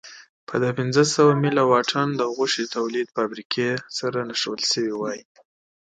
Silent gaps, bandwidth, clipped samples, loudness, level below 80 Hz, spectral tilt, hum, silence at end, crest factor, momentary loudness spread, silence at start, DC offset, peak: 0.29-0.47 s, 3.45-3.50 s; 9.4 kHz; under 0.1%; -22 LUFS; -70 dBFS; -4.5 dB/octave; none; 0.65 s; 18 dB; 10 LU; 0.05 s; under 0.1%; -4 dBFS